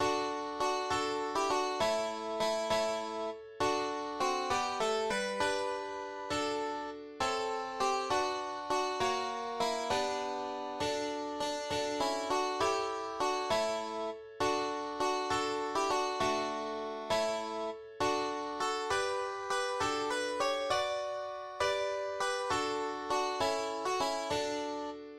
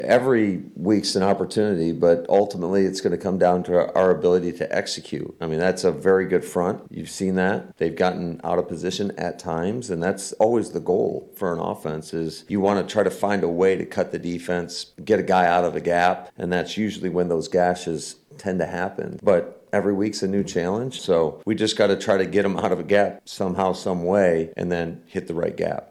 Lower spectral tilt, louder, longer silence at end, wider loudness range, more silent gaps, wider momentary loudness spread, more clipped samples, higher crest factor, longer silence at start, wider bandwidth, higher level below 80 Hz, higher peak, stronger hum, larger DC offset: second, -2.5 dB/octave vs -5.5 dB/octave; second, -34 LUFS vs -23 LUFS; about the same, 0 s vs 0.05 s; second, 1 LU vs 4 LU; neither; second, 6 LU vs 9 LU; neither; about the same, 18 dB vs 16 dB; about the same, 0 s vs 0 s; first, 15 kHz vs 13.5 kHz; second, -64 dBFS vs -56 dBFS; second, -16 dBFS vs -6 dBFS; neither; neither